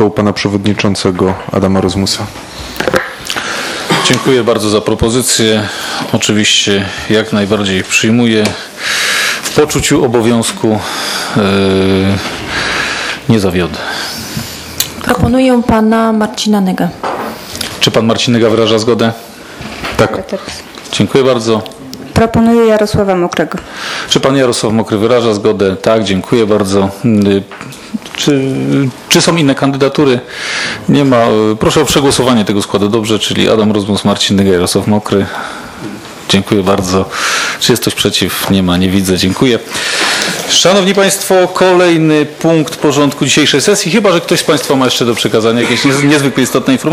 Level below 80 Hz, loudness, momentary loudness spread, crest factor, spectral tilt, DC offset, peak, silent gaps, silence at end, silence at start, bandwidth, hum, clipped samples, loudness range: -38 dBFS; -11 LUFS; 9 LU; 10 dB; -4 dB/octave; under 0.1%; 0 dBFS; none; 0 s; 0 s; 17.5 kHz; none; 0.3%; 4 LU